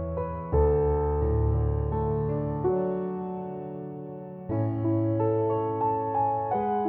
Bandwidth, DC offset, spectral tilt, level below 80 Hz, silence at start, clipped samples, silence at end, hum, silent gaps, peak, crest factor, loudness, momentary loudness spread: 3.3 kHz; under 0.1%; -13.5 dB/octave; -36 dBFS; 0 s; under 0.1%; 0 s; none; none; -12 dBFS; 14 dB; -27 LUFS; 11 LU